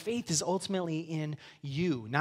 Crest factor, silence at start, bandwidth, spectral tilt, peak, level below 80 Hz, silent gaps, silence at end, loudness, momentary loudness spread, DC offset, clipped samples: 20 dB; 0 s; 15.5 kHz; -4.5 dB/octave; -12 dBFS; -68 dBFS; none; 0 s; -33 LUFS; 9 LU; under 0.1%; under 0.1%